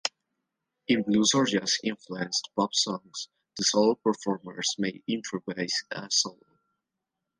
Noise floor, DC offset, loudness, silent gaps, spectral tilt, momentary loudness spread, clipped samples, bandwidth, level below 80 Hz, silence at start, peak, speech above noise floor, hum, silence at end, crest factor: -85 dBFS; under 0.1%; -27 LUFS; none; -3 dB/octave; 12 LU; under 0.1%; 10.5 kHz; -70 dBFS; 0.05 s; -8 dBFS; 58 dB; none; 1.05 s; 20 dB